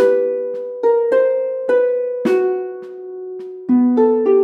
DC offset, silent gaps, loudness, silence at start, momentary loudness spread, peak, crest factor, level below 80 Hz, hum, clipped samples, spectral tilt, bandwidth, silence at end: under 0.1%; none; -17 LUFS; 0 s; 16 LU; -4 dBFS; 12 dB; -80 dBFS; none; under 0.1%; -7.5 dB/octave; 6.4 kHz; 0 s